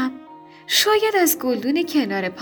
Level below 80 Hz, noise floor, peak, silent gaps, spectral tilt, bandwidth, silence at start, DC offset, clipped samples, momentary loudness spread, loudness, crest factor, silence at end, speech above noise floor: -66 dBFS; -43 dBFS; -4 dBFS; none; -2 dB/octave; over 20 kHz; 0 s; under 0.1%; under 0.1%; 6 LU; -19 LUFS; 18 dB; 0 s; 24 dB